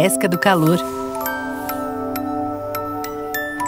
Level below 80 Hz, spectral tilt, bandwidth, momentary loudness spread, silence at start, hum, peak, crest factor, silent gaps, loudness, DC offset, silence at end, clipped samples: -50 dBFS; -5 dB/octave; 16.5 kHz; 9 LU; 0 s; none; -2 dBFS; 18 dB; none; -21 LUFS; under 0.1%; 0 s; under 0.1%